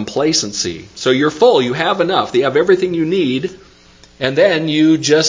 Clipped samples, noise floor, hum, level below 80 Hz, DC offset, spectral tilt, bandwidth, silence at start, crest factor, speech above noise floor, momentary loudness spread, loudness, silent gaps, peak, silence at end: under 0.1%; -45 dBFS; none; -52 dBFS; under 0.1%; -4 dB/octave; 7.6 kHz; 0 s; 14 dB; 31 dB; 9 LU; -14 LUFS; none; 0 dBFS; 0 s